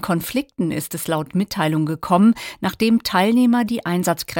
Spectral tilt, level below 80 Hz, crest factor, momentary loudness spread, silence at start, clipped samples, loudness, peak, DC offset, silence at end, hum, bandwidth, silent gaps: -5.5 dB/octave; -52 dBFS; 16 dB; 8 LU; 0 s; under 0.1%; -19 LUFS; -4 dBFS; under 0.1%; 0 s; none; 17 kHz; none